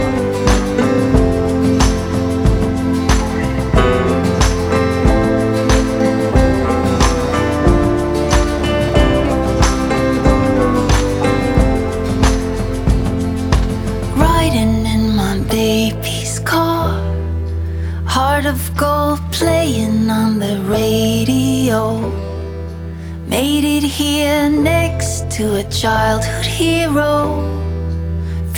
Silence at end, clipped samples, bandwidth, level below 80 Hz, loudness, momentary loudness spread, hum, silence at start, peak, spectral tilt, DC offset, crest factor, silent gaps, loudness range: 0 s; under 0.1%; 19 kHz; -22 dBFS; -15 LUFS; 6 LU; none; 0 s; 0 dBFS; -5.5 dB/octave; under 0.1%; 14 dB; none; 3 LU